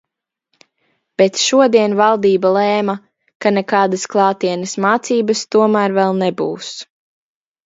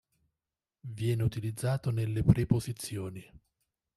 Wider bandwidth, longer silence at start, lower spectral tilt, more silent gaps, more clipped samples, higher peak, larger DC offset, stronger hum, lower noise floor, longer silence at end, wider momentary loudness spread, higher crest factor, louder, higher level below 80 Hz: second, 7.8 kHz vs 13.5 kHz; first, 1.2 s vs 0.85 s; second, -4.5 dB/octave vs -7 dB/octave; first, 3.35-3.40 s vs none; neither; first, 0 dBFS vs -8 dBFS; neither; neither; second, -71 dBFS vs under -90 dBFS; about the same, 0.8 s vs 0.75 s; second, 10 LU vs 17 LU; second, 16 dB vs 24 dB; first, -15 LUFS vs -31 LUFS; second, -64 dBFS vs -50 dBFS